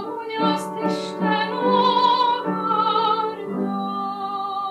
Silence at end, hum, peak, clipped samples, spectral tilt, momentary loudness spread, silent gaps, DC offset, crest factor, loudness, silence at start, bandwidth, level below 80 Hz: 0 s; none; -8 dBFS; under 0.1%; -5.5 dB/octave; 9 LU; none; under 0.1%; 14 dB; -21 LUFS; 0 s; 12.5 kHz; -72 dBFS